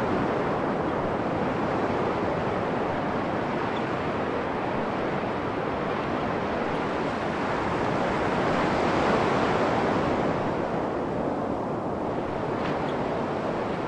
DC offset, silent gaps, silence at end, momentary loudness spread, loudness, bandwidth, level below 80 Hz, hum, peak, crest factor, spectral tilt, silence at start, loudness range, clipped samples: under 0.1%; none; 0 s; 5 LU; -27 LUFS; 11 kHz; -50 dBFS; none; -10 dBFS; 16 dB; -7 dB/octave; 0 s; 3 LU; under 0.1%